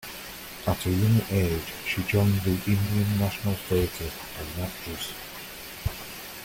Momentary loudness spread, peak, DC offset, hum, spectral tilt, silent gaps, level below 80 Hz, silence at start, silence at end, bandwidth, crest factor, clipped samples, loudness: 14 LU; -12 dBFS; under 0.1%; none; -5.5 dB/octave; none; -46 dBFS; 0 s; 0 s; 17 kHz; 16 dB; under 0.1%; -28 LUFS